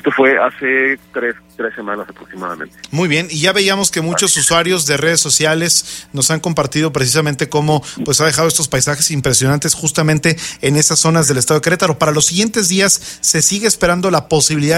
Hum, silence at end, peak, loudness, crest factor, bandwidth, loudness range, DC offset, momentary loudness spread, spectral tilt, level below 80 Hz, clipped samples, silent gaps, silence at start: none; 0 s; 0 dBFS; -13 LUFS; 14 dB; 16.5 kHz; 4 LU; under 0.1%; 11 LU; -3 dB/octave; -44 dBFS; under 0.1%; none; 0.05 s